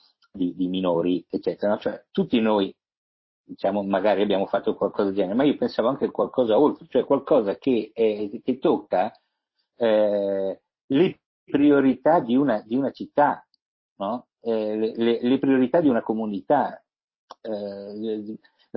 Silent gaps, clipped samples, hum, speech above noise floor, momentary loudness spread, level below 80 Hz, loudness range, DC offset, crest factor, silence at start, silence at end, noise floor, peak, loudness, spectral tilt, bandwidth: 2.97-3.44 s, 10.84-10.88 s, 11.26-11.47 s, 13.62-13.96 s, 17.03-17.08 s, 17.16-17.28 s; under 0.1%; none; 54 dB; 11 LU; -64 dBFS; 3 LU; under 0.1%; 16 dB; 0.35 s; 0.4 s; -77 dBFS; -6 dBFS; -23 LUFS; -9.5 dB/octave; 5.8 kHz